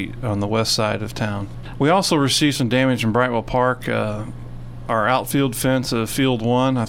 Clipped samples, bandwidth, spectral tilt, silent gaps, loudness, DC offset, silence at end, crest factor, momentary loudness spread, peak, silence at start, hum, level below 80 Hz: under 0.1%; 16.5 kHz; -5 dB/octave; none; -20 LUFS; under 0.1%; 0 s; 16 dB; 11 LU; -4 dBFS; 0 s; none; -40 dBFS